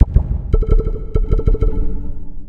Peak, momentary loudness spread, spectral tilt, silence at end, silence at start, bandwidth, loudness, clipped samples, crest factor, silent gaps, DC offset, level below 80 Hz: 0 dBFS; 9 LU; -11 dB/octave; 0 s; 0 s; 3.2 kHz; -20 LUFS; 0.4%; 14 dB; none; under 0.1%; -16 dBFS